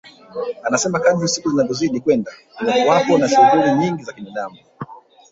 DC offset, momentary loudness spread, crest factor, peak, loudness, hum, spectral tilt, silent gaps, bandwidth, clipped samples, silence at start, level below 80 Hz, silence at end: under 0.1%; 20 LU; 16 dB; -2 dBFS; -17 LUFS; none; -4.5 dB/octave; none; 8 kHz; under 0.1%; 0.35 s; -58 dBFS; 0.35 s